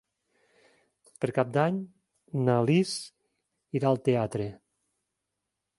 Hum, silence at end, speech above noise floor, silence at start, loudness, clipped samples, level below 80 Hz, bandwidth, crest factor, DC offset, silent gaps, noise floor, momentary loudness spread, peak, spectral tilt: none; 1.25 s; 58 dB; 1.2 s; -28 LUFS; under 0.1%; -66 dBFS; 11.5 kHz; 22 dB; under 0.1%; none; -84 dBFS; 12 LU; -8 dBFS; -6.5 dB/octave